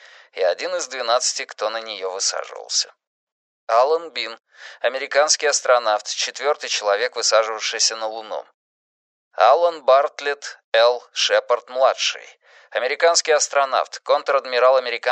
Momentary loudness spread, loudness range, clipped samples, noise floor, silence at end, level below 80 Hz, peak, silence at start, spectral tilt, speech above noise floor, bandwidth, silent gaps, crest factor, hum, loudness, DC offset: 12 LU; 4 LU; under 0.1%; under -90 dBFS; 0 s; -90 dBFS; -2 dBFS; 0.35 s; 2.5 dB/octave; over 70 dB; 9.4 kHz; 3.07-3.67 s, 8.54-9.31 s, 10.64-10.72 s; 18 dB; none; -19 LUFS; under 0.1%